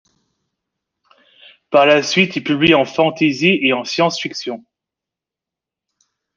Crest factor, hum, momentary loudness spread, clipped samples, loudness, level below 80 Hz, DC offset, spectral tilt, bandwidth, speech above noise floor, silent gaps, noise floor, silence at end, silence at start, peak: 18 dB; none; 12 LU; under 0.1%; -15 LUFS; -58 dBFS; under 0.1%; -4.5 dB/octave; 7.6 kHz; 71 dB; none; -86 dBFS; 1.75 s; 1.7 s; -2 dBFS